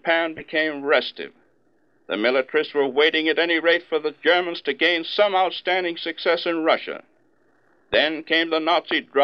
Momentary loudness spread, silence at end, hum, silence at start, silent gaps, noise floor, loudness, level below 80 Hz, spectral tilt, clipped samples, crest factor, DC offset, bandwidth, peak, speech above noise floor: 8 LU; 0 s; none; 0.05 s; none; -64 dBFS; -21 LUFS; -64 dBFS; -5 dB/octave; under 0.1%; 18 dB; under 0.1%; 6.4 kHz; -4 dBFS; 43 dB